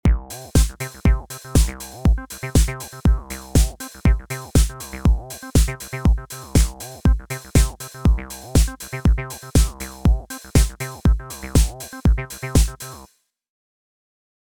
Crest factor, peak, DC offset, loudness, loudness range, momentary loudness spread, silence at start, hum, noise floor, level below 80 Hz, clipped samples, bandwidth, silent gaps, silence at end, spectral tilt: 18 dB; -2 dBFS; under 0.1%; -22 LUFS; 1 LU; 5 LU; 0.05 s; none; -51 dBFS; -22 dBFS; under 0.1%; 20 kHz; none; 1.5 s; -5.5 dB/octave